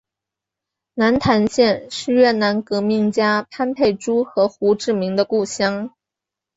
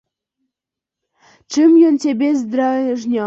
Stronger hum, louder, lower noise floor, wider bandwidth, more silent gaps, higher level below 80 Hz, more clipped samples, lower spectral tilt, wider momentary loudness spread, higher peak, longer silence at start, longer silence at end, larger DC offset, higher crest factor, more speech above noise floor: neither; second, -18 LUFS vs -15 LUFS; about the same, -86 dBFS vs -85 dBFS; about the same, 8 kHz vs 8 kHz; neither; first, -52 dBFS vs -66 dBFS; neither; about the same, -5 dB/octave vs -5 dB/octave; second, 6 LU vs 9 LU; about the same, -4 dBFS vs -4 dBFS; second, 0.95 s vs 1.5 s; first, 0.7 s vs 0 s; neither; about the same, 16 dB vs 14 dB; about the same, 68 dB vs 71 dB